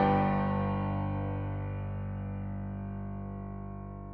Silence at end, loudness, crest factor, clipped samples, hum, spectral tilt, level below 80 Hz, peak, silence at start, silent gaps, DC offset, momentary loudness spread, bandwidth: 0 s; -34 LUFS; 16 dB; under 0.1%; 50 Hz at -50 dBFS; -11 dB/octave; -46 dBFS; -16 dBFS; 0 s; none; under 0.1%; 12 LU; 4.6 kHz